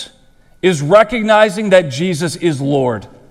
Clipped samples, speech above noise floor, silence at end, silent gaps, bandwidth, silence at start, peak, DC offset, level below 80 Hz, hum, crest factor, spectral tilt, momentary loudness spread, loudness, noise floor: 0.1%; 34 dB; 0.25 s; none; 13.5 kHz; 0 s; 0 dBFS; under 0.1%; -46 dBFS; none; 14 dB; -5.5 dB/octave; 8 LU; -13 LUFS; -47 dBFS